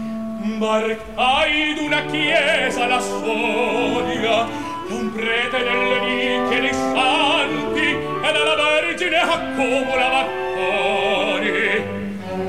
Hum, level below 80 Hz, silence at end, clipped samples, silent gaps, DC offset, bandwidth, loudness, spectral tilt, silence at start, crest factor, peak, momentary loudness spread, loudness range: none; -48 dBFS; 0 s; under 0.1%; none; 0.7%; 15 kHz; -19 LUFS; -3.5 dB/octave; 0 s; 14 dB; -4 dBFS; 7 LU; 2 LU